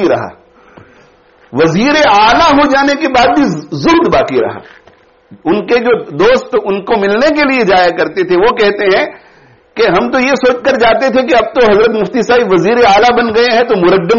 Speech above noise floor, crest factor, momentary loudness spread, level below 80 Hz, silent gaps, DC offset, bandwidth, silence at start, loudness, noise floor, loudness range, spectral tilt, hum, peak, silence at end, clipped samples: 35 dB; 10 dB; 7 LU; -38 dBFS; none; under 0.1%; 7.2 kHz; 0 s; -9 LUFS; -45 dBFS; 3 LU; -3 dB/octave; none; 0 dBFS; 0 s; under 0.1%